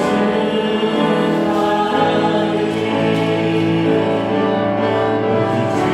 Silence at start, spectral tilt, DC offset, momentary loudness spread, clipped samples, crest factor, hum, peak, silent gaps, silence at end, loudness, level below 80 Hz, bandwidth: 0 s; -6.5 dB/octave; under 0.1%; 2 LU; under 0.1%; 14 dB; none; -2 dBFS; none; 0 s; -16 LUFS; -54 dBFS; 13 kHz